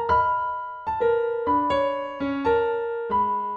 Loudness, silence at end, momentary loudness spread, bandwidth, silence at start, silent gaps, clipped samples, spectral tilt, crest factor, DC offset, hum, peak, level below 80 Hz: -24 LUFS; 0 s; 7 LU; 7.8 kHz; 0 s; none; under 0.1%; -7 dB/octave; 14 dB; under 0.1%; none; -10 dBFS; -50 dBFS